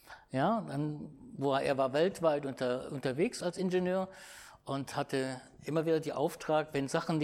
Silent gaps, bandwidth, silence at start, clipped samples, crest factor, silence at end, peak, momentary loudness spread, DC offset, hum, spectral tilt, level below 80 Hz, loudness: none; 16 kHz; 0.05 s; under 0.1%; 18 dB; 0 s; -16 dBFS; 10 LU; under 0.1%; none; -6 dB/octave; -68 dBFS; -34 LUFS